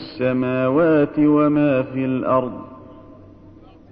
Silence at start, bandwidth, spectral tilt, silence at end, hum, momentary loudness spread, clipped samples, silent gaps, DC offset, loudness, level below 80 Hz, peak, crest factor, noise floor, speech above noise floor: 0 s; 5.2 kHz; -11 dB/octave; 0.8 s; none; 10 LU; under 0.1%; none; under 0.1%; -18 LUFS; -52 dBFS; -6 dBFS; 14 dB; -45 dBFS; 27 dB